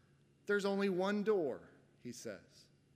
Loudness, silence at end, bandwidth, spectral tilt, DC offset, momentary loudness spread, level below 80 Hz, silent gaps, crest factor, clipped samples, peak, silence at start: -37 LUFS; 0.55 s; 15 kHz; -5.5 dB/octave; under 0.1%; 19 LU; -86 dBFS; none; 18 dB; under 0.1%; -22 dBFS; 0.5 s